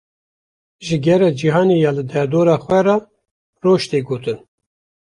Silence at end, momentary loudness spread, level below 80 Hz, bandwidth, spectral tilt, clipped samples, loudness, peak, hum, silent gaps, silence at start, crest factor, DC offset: 0.65 s; 9 LU; -56 dBFS; 11 kHz; -7 dB/octave; under 0.1%; -16 LUFS; -2 dBFS; none; 3.31-3.53 s; 0.8 s; 16 dB; under 0.1%